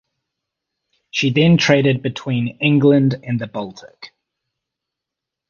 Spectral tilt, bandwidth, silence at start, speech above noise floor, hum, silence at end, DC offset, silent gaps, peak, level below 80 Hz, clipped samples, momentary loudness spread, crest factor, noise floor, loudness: -6.5 dB/octave; 7.2 kHz; 1.15 s; 67 dB; none; 1.45 s; under 0.1%; none; 0 dBFS; -54 dBFS; under 0.1%; 15 LU; 18 dB; -84 dBFS; -16 LUFS